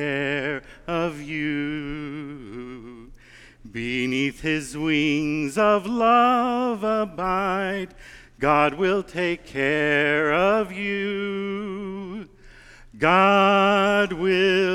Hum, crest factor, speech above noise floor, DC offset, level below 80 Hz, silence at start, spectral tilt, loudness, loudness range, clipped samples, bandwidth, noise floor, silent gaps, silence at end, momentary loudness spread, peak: none; 20 dB; 27 dB; under 0.1%; -50 dBFS; 0 s; -5.5 dB/octave; -22 LUFS; 8 LU; under 0.1%; 14 kHz; -48 dBFS; none; 0 s; 15 LU; -4 dBFS